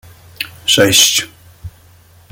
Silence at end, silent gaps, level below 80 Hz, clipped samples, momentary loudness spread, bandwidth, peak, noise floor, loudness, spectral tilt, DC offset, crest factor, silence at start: 0.65 s; none; -46 dBFS; under 0.1%; 18 LU; over 20 kHz; 0 dBFS; -45 dBFS; -10 LUFS; -1.5 dB/octave; under 0.1%; 16 dB; 0.4 s